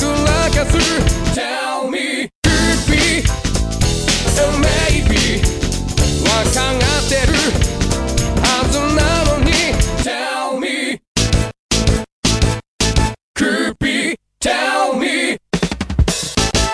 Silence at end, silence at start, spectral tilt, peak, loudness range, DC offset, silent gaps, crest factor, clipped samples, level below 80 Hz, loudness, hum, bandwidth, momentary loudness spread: 0 s; 0 s; -4 dB/octave; -2 dBFS; 3 LU; under 0.1%; 2.35-2.42 s, 11.08-11.15 s, 11.59-11.69 s, 12.12-12.23 s, 12.68-12.79 s, 13.23-13.34 s; 14 dB; under 0.1%; -22 dBFS; -16 LUFS; none; 11 kHz; 6 LU